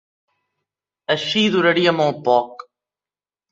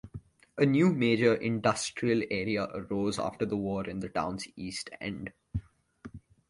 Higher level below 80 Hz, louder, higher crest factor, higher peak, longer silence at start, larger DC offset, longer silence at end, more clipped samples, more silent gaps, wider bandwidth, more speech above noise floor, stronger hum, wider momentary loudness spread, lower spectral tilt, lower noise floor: second, -64 dBFS vs -56 dBFS; first, -18 LUFS vs -30 LUFS; about the same, 20 dB vs 20 dB; first, -2 dBFS vs -12 dBFS; first, 1.1 s vs 0.05 s; neither; first, 0.95 s vs 0.3 s; neither; neither; second, 7.8 kHz vs 11.5 kHz; first, over 73 dB vs 22 dB; first, 50 Hz at -50 dBFS vs none; second, 11 LU vs 17 LU; about the same, -5 dB/octave vs -5.5 dB/octave; first, under -90 dBFS vs -52 dBFS